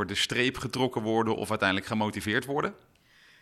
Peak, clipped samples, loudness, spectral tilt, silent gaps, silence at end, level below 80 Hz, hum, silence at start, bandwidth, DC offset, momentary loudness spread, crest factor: -8 dBFS; under 0.1%; -28 LUFS; -4.5 dB/octave; none; 0.65 s; -58 dBFS; none; 0 s; 13.5 kHz; under 0.1%; 5 LU; 20 dB